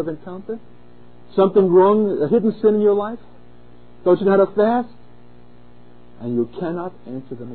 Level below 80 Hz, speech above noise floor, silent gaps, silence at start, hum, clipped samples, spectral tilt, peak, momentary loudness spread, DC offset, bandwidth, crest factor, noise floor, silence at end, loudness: -58 dBFS; 30 dB; none; 0 s; 60 Hz at -45 dBFS; under 0.1%; -12.5 dB/octave; -4 dBFS; 19 LU; 1%; 4.5 kHz; 16 dB; -48 dBFS; 0 s; -18 LUFS